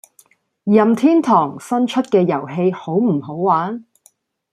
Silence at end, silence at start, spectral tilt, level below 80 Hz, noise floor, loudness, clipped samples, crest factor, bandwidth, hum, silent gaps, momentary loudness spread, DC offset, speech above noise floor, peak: 0.7 s; 0.65 s; -7.5 dB/octave; -64 dBFS; -56 dBFS; -17 LUFS; under 0.1%; 16 dB; 13 kHz; none; none; 7 LU; under 0.1%; 40 dB; -2 dBFS